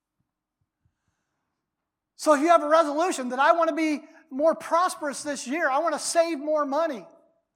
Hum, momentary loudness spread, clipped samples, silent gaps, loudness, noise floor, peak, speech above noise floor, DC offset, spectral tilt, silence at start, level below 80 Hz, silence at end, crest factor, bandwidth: none; 11 LU; under 0.1%; none; -24 LUFS; -84 dBFS; -6 dBFS; 61 dB; under 0.1%; -2 dB/octave; 2.2 s; -84 dBFS; 0.5 s; 20 dB; 15.5 kHz